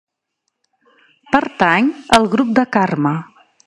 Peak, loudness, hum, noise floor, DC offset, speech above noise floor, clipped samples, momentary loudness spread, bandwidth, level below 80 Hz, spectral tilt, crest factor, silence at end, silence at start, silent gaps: 0 dBFS; -15 LUFS; none; -74 dBFS; under 0.1%; 59 dB; under 0.1%; 6 LU; 15 kHz; -48 dBFS; -5 dB/octave; 18 dB; 0.45 s; 1.3 s; none